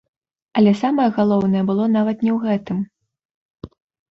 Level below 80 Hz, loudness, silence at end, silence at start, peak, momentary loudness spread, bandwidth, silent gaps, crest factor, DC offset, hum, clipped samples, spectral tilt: -56 dBFS; -18 LUFS; 0.5 s; 0.55 s; -4 dBFS; 9 LU; 6.6 kHz; 3.25-3.54 s; 16 dB; under 0.1%; none; under 0.1%; -8.5 dB/octave